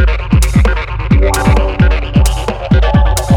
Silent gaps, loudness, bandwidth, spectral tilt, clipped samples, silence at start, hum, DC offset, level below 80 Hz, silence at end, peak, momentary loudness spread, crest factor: none; -12 LUFS; 17.5 kHz; -6 dB/octave; under 0.1%; 0 s; none; under 0.1%; -12 dBFS; 0 s; 0 dBFS; 4 LU; 10 dB